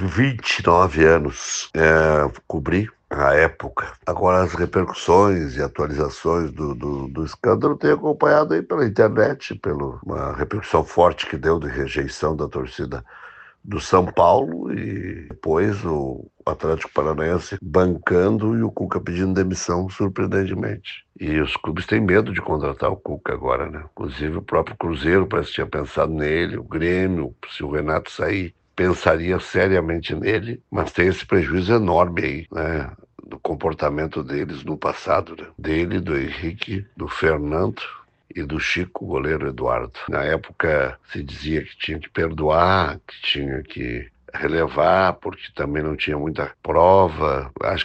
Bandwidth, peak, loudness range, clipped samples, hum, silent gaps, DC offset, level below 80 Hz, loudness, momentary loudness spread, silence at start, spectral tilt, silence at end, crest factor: 8.6 kHz; -2 dBFS; 5 LU; under 0.1%; none; none; under 0.1%; -40 dBFS; -21 LUFS; 12 LU; 0 s; -6 dB/octave; 0 s; 20 dB